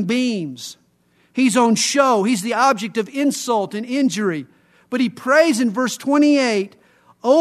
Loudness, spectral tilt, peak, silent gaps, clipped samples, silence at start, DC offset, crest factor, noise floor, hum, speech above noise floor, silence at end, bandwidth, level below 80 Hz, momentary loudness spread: -18 LUFS; -4 dB/octave; 0 dBFS; none; under 0.1%; 0 s; under 0.1%; 18 dB; -59 dBFS; none; 42 dB; 0 s; 13.5 kHz; -72 dBFS; 12 LU